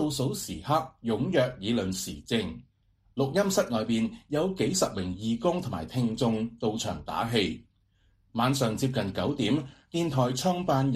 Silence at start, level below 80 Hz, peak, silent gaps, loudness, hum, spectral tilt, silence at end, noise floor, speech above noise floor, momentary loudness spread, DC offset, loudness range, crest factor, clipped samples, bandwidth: 0 s; -54 dBFS; -12 dBFS; none; -29 LUFS; none; -5 dB/octave; 0 s; -67 dBFS; 39 dB; 7 LU; under 0.1%; 2 LU; 18 dB; under 0.1%; 15.5 kHz